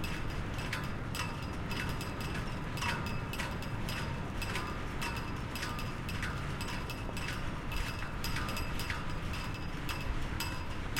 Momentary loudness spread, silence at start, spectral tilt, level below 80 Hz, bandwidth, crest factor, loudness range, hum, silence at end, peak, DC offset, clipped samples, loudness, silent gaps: 3 LU; 0 s; -4.5 dB/octave; -42 dBFS; 17 kHz; 16 dB; 1 LU; none; 0 s; -20 dBFS; under 0.1%; under 0.1%; -38 LUFS; none